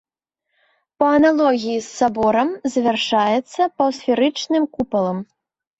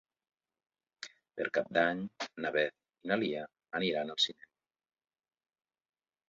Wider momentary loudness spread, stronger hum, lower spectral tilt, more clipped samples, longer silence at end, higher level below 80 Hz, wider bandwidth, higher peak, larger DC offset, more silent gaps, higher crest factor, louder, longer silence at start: second, 7 LU vs 16 LU; neither; first, -4.5 dB/octave vs -2 dB/octave; neither; second, 0.55 s vs 2 s; first, -56 dBFS vs -78 dBFS; first, 8.2 kHz vs 7.4 kHz; first, -4 dBFS vs -14 dBFS; neither; neither; second, 16 dB vs 24 dB; first, -18 LUFS vs -34 LUFS; about the same, 1 s vs 1 s